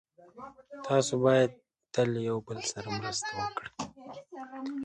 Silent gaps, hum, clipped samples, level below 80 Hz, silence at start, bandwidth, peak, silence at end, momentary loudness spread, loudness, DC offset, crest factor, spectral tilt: none; none; under 0.1%; -66 dBFS; 0.2 s; 11.5 kHz; -12 dBFS; 0 s; 22 LU; -31 LUFS; under 0.1%; 20 dB; -4.5 dB/octave